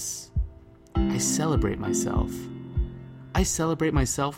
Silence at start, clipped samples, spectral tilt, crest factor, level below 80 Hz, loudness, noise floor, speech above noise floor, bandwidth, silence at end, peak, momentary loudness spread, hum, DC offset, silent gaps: 0 s; under 0.1%; -5 dB/octave; 18 dB; -34 dBFS; -27 LUFS; -47 dBFS; 22 dB; 16.5 kHz; 0 s; -10 dBFS; 10 LU; none; under 0.1%; none